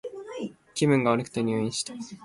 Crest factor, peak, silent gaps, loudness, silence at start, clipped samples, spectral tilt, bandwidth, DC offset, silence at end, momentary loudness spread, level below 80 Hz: 18 dB; -10 dBFS; none; -27 LUFS; 0.05 s; under 0.1%; -5 dB/octave; 11.5 kHz; under 0.1%; 0 s; 14 LU; -64 dBFS